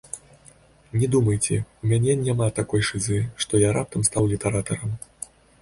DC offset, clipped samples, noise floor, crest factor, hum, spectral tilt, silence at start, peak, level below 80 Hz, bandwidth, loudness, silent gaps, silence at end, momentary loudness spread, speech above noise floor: under 0.1%; under 0.1%; -53 dBFS; 18 dB; none; -5 dB/octave; 0.15 s; -4 dBFS; -46 dBFS; 11.5 kHz; -23 LUFS; none; 0.65 s; 14 LU; 31 dB